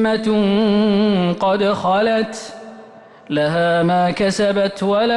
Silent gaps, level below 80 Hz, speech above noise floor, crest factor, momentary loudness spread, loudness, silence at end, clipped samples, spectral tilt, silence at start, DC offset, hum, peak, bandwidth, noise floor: none; -52 dBFS; 25 dB; 8 dB; 8 LU; -17 LUFS; 0 s; under 0.1%; -6 dB/octave; 0 s; under 0.1%; none; -8 dBFS; 11.5 kHz; -41 dBFS